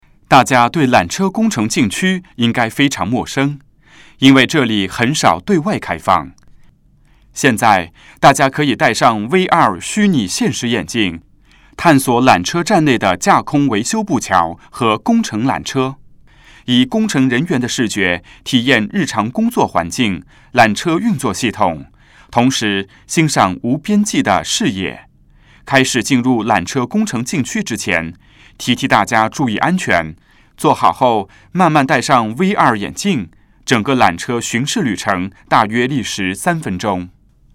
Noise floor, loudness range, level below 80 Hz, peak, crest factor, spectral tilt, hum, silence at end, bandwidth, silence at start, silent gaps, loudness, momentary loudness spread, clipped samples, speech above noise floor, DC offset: -50 dBFS; 3 LU; -48 dBFS; 0 dBFS; 14 dB; -4.5 dB/octave; none; 0.45 s; 16.5 kHz; 0.3 s; none; -14 LUFS; 8 LU; 0.1%; 35 dB; under 0.1%